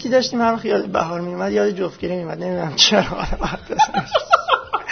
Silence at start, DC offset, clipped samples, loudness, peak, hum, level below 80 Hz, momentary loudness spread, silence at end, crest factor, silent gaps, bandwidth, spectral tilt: 0 s; under 0.1%; under 0.1%; -19 LUFS; 0 dBFS; none; -38 dBFS; 11 LU; 0 s; 20 dB; none; 6.6 kHz; -3.5 dB/octave